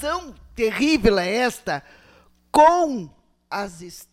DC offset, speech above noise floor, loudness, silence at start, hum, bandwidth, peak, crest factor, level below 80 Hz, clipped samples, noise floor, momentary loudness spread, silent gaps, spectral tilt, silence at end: under 0.1%; 34 dB; -20 LUFS; 0 s; none; 16 kHz; -4 dBFS; 18 dB; -42 dBFS; under 0.1%; -55 dBFS; 18 LU; none; -4.5 dB/octave; 0.1 s